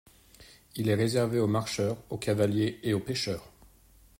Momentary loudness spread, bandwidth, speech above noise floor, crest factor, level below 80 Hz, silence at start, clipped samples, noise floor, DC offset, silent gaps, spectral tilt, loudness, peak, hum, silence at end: 8 LU; 16 kHz; 30 dB; 18 dB; -60 dBFS; 0.4 s; under 0.1%; -59 dBFS; under 0.1%; none; -6 dB/octave; -29 LUFS; -14 dBFS; none; 0.7 s